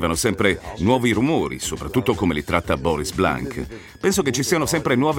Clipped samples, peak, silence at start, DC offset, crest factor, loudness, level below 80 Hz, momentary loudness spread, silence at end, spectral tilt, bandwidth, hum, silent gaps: under 0.1%; -2 dBFS; 0 s; under 0.1%; 20 dB; -21 LUFS; -42 dBFS; 7 LU; 0 s; -4.5 dB/octave; 17 kHz; none; none